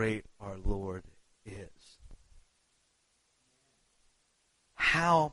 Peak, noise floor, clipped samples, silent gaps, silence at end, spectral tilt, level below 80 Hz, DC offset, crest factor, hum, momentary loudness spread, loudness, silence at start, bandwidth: -14 dBFS; -74 dBFS; under 0.1%; none; 0 s; -5 dB/octave; -46 dBFS; under 0.1%; 22 dB; none; 23 LU; -31 LUFS; 0 s; 11.5 kHz